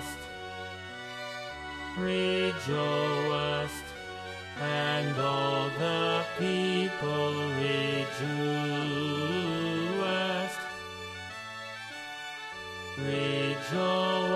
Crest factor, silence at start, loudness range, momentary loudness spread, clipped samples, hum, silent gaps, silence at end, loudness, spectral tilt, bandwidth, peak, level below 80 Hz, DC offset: 14 dB; 0 s; 5 LU; 11 LU; under 0.1%; none; none; 0 s; -31 LUFS; -5 dB/octave; 13.5 kHz; -16 dBFS; -62 dBFS; under 0.1%